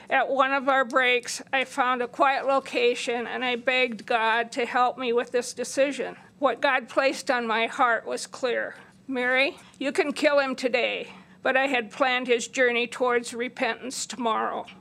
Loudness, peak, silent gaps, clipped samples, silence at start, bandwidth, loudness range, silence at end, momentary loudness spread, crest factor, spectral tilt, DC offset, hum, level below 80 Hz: -25 LUFS; -6 dBFS; none; under 0.1%; 0 s; 14.5 kHz; 2 LU; 0 s; 8 LU; 18 dB; -2 dB/octave; under 0.1%; none; -78 dBFS